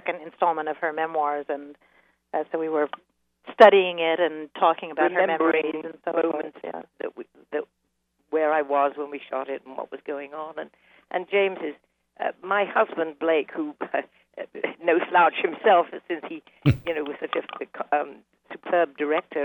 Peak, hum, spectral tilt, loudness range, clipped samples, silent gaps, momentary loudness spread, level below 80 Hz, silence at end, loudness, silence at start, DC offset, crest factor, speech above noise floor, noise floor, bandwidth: -2 dBFS; none; -7.5 dB/octave; 7 LU; under 0.1%; none; 16 LU; -56 dBFS; 0 s; -24 LUFS; 0.05 s; under 0.1%; 24 dB; 49 dB; -73 dBFS; 13 kHz